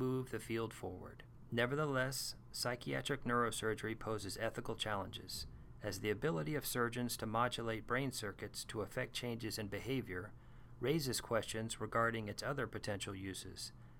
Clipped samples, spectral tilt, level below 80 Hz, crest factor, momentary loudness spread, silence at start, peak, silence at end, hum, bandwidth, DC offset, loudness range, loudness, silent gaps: under 0.1%; -4.5 dB/octave; -60 dBFS; 18 dB; 10 LU; 0 s; -22 dBFS; 0 s; none; 17.5 kHz; under 0.1%; 2 LU; -41 LUFS; none